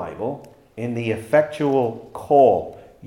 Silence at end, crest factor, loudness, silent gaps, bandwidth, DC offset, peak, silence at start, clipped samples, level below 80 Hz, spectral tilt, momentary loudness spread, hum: 0 s; 18 dB; -20 LUFS; none; 16 kHz; under 0.1%; -2 dBFS; 0 s; under 0.1%; -60 dBFS; -7.5 dB/octave; 18 LU; none